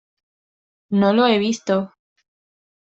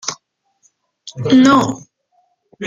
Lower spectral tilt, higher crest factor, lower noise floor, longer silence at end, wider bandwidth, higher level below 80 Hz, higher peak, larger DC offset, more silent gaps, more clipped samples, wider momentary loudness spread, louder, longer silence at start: about the same, -5.5 dB/octave vs -5 dB/octave; about the same, 18 dB vs 16 dB; first, under -90 dBFS vs -62 dBFS; first, 1 s vs 0 s; about the same, 8 kHz vs 7.6 kHz; second, -66 dBFS vs -56 dBFS; about the same, -4 dBFS vs -2 dBFS; neither; neither; neither; second, 8 LU vs 24 LU; second, -19 LUFS vs -13 LUFS; first, 0.9 s vs 0.05 s